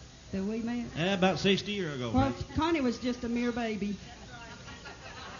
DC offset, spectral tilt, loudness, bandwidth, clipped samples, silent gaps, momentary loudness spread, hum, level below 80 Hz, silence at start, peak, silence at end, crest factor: under 0.1%; -5.5 dB/octave; -31 LUFS; 7.4 kHz; under 0.1%; none; 17 LU; none; -50 dBFS; 0 s; -14 dBFS; 0 s; 18 dB